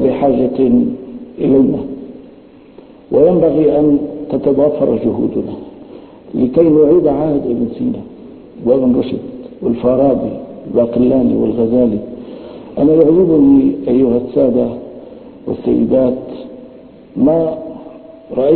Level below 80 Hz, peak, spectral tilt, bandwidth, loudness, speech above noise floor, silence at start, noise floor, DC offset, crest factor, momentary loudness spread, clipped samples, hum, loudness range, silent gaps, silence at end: -42 dBFS; 0 dBFS; -13 dB/octave; 4.4 kHz; -13 LUFS; 28 dB; 0 s; -40 dBFS; under 0.1%; 14 dB; 20 LU; under 0.1%; none; 4 LU; none; 0 s